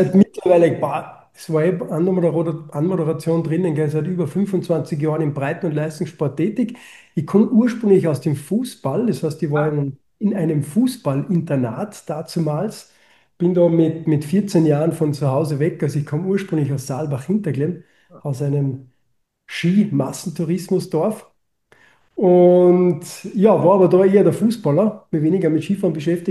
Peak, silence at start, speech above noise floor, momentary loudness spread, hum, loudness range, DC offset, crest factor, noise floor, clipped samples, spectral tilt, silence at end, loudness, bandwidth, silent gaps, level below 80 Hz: -2 dBFS; 0 s; 51 dB; 11 LU; none; 7 LU; under 0.1%; 16 dB; -69 dBFS; under 0.1%; -8 dB/octave; 0 s; -19 LUFS; 12.5 kHz; none; -62 dBFS